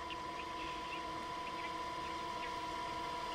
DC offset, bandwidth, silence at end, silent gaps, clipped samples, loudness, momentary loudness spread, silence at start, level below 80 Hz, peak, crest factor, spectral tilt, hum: under 0.1%; 16 kHz; 0 s; none; under 0.1%; -42 LUFS; 2 LU; 0 s; -62 dBFS; -32 dBFS; 12 dB; -3.5 dB/octave; none